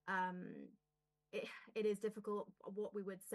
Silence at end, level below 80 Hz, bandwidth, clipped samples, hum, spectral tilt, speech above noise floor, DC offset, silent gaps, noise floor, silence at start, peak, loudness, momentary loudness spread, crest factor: 0 s; under -90 dBFS; 12 kHz; under 0.1%; none; -5.5 dB/octave; 45 dB; under 0.1%; none; -90 dBFS; 0.05 s; -30 dBFS; -45 LUFS; 11 LU; 16 dB